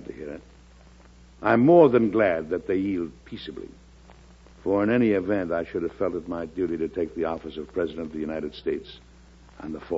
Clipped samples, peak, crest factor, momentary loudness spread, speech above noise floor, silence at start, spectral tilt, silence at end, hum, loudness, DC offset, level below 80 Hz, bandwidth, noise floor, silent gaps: under 0.1%; -4 dBFS; 20 dB; 20 LU; 27 dB; 0 s; -8.5 dB/octave; 0 s; none; -24 LUFS; under 0.1%; -52 dBFS; 7.6 kHz; -51 dBFS; none